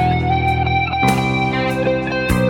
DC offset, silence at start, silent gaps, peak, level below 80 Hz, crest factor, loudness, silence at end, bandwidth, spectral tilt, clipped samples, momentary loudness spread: under 0.1%; 0 s; none; -2 dBFS; -30 dBFS; 16 dB; -17 LUFS; 0 s; 18.5 kHz; -6 dB/octave; under 0.1%; 3 LU